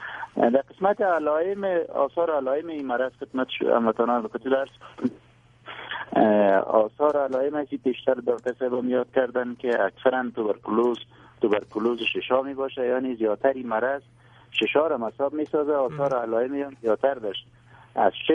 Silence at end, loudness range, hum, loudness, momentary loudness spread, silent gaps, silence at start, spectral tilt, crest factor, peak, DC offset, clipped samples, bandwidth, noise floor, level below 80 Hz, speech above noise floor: 0 s; 2 LU; none; -25 LUFS; 8 LU; none; 0 s; -7 dB/octave; 20 dB; -4 dBFS; under 0.1%; under 0.1%; 7.6 kHz; -55 dBFS; -66 dBFS; 31 dB